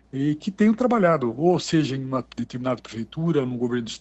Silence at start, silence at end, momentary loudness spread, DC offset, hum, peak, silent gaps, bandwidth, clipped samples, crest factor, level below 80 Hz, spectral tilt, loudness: 0.15 s; 0.05 s; 9 LU; under 0.1%; none; -6 dBFS; none; 8.4 kHz; under 0.1%; 16 dB; -58 dBFS; -6.5 dB/octave; -23 LUFS